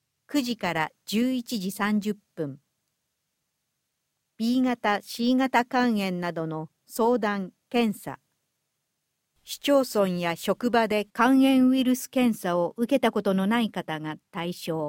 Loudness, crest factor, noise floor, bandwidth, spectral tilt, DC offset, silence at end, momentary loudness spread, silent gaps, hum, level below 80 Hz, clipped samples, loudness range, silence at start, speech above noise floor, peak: -25 LUFS; 20 dB; -79 dBFS; 17 kHz; -5 dB/octave; under 0.1%; 0 s; 12 LU; none; none; -68 dBFS; under 0.1%; 8 LU; 0.3 s; 55 dB; -6 dBFS